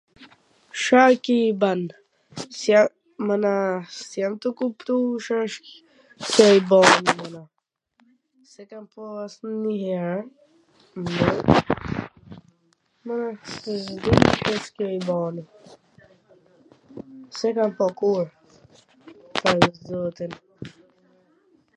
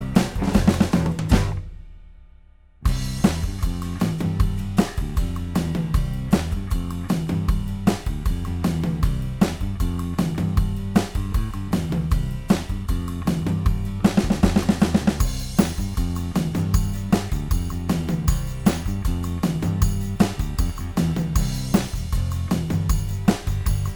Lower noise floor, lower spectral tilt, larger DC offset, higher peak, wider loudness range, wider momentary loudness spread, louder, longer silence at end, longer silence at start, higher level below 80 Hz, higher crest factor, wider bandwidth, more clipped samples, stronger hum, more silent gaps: first, -68 dBFS vs -50 dBFS; second, -5 dB/octave vs -6.5 dB/octave; neither; about the same, 0 dBFS vs -2 dBFS; first, 9 LU vs 3 LU; first, 24 LU vs 7 LU; about the same, -22 LUFS vs -23 LUFS; first, 1.1 s vs 0 s; first, 0.2 s vs 0 s; second, -50 dBFS vs -28 dBFS; about the same, 24 dB vs 20 dB; second, 11.5 kHz vs over 20 kHz; neither; neither; neither